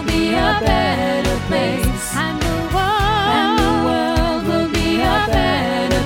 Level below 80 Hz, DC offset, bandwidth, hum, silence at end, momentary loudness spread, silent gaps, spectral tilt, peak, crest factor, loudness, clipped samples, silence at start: -26 dBFS; under 0.1%; 17.5 kHz; none; 0 s; 4 LU; none; -5 dB/octave; -2 dBFS; 14 dB; -17 LUFS; under 0.1%; 0 s